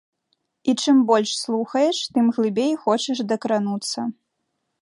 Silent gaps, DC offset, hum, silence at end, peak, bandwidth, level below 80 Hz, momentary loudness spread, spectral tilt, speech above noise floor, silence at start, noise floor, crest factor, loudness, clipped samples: none; under 0.1%; none; 0.7 s; -4 dBFS; 11.5 kHz; -74 dBFS; 9 LU; -4.5 dB/octave; 55 dB; 0.65 s; -76 dBFS; 18 dB; -21 LUFS; under 0.1%